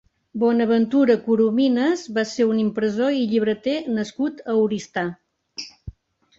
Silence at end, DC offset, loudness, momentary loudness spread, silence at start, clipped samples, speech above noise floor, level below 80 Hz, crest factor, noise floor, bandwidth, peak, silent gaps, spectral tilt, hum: 0.5 s; under 0.1%; -21 LUFS; 14 LU; 0.35 s; under 0.1%; 21 dB; -54 dBFS; 16 dB; -42 dBFS; 7.8 kHz; -6 dBFS; none; -6 dB/octave; none